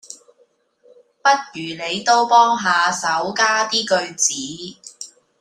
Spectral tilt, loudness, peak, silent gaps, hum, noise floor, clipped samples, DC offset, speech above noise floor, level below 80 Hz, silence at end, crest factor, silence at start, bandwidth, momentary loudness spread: -1 dB/octave; -17 LUFS; -2 dBFS; none; none; -60 dBFS; under 0.1%; under 0.1%; 42 dB; -68 dBFS; 0.35 s; 18 dB; 0.1 s; 14.5 kHz; 21 LU